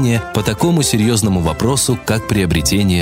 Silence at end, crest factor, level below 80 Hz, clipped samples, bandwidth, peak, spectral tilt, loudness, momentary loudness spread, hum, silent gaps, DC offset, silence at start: 0 s; 14 dB; -32 dBFS; under 0.1%; 16.5 kHz; 0 dBFS; -5 dB/octave; -15 LUFS; 3 LU; none; none; under 0.1%; 0 s